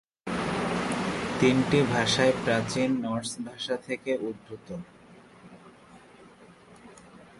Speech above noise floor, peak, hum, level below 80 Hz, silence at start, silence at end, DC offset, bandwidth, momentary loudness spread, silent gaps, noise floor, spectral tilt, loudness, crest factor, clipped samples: 26 dB; -8 dBFS; none; -56 dBFS; 0.25 s; 0.2 s; under 0.1%; 11.5 kHz; 17 LU; none; -53 dBFS; -5 dB/octave; -27 LUFS; 20 dB; under 0.1%